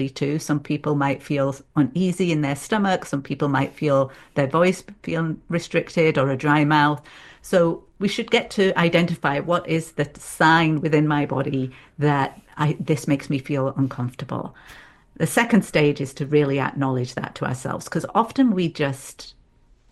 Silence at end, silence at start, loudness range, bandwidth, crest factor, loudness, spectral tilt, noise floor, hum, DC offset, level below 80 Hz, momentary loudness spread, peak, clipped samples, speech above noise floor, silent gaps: 0.6 s; 0 s; 4 LU; 12.5 kHz; 20 dB; -22 LUFS; -6 dB/octave; -56 dBFS; none; under 0.1%; -54 dBFS; 10 LU; -2 dBFS; under 0.1%; 34 dB; none